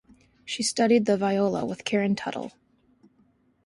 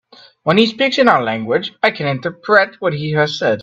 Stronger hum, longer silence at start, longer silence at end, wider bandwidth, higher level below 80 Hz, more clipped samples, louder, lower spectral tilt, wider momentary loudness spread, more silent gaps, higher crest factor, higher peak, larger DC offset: neither; about the same, 0.45 s vs 0.45 s; first, 1.15 s vs 0 s; first, 11.5 kHz vs 8.2 kHz; second, -66 dBFS vs -58 dBFS; neither; second, -25 LUFS vs -15 LUFS; about the same, -4.5 dB/octave vs -5.5 dB/octave; first, 15 LU vs 8 LU; neither; about the same, 18 dB vs 16 dB; second, -8 dBFS vs 0 dBFS; neither